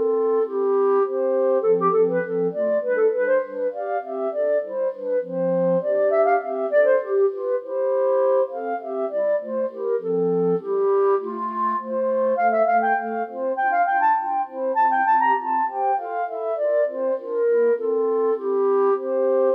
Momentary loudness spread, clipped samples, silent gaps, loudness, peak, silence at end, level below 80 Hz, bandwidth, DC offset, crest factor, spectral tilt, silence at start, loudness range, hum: 7 LU; under 0.1%; none; -22 LUFS; -8 dBFS; 0 s; -82 dBFS; 4.2 kHz; under 0.1%; 12 dB; -9.5 dB/octave; 0 s; 2 LU; 50 Hz at -70 dBFS